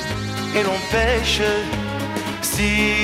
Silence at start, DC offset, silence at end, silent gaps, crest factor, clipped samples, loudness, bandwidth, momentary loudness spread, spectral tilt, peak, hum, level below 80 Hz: 0 s; under 0.1%; 0 s; none; 14 dB; under 0.1%; -20 LUFS; 16.5 kHz; 7 LU; -3.5 dB/octave; -6 dBFS; none; -32 dBFS